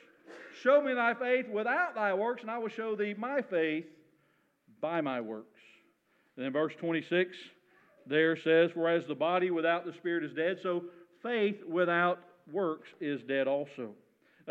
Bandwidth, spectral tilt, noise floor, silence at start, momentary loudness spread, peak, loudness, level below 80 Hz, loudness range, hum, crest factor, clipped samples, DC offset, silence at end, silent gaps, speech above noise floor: 7.6 kHz; -7 dB/octave; -72 dBFS; 0.3 s; 13 LU; -14 dBFS; -32 LUFS; under -90 dBFS; 6 LU; none; 18 dB; under 0.1%; under 0.1%; 0 s; none; 41 dB